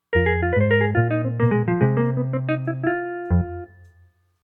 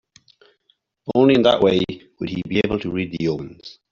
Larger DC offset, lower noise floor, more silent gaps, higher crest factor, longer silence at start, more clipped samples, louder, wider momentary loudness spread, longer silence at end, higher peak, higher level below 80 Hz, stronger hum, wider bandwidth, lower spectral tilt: neither; second, -57 dBFS vs -65 dBFS; neither; about the same, 16 dB vs 18 dB; second, 0.1 s vs 1.05 s; neither; about the same, -21 LUFS vs -20 LUFS; second, 6 LU vs 17 LU; first, 0.75 s vs 0.2 s; about the same, -4 dBFS vs -2 dBFS; first, -40 dBFS vs -50 dBFS; neither; second, 4 kHz vs 7.2 kHz; first, -11 dB/octave vs -7 dB/octave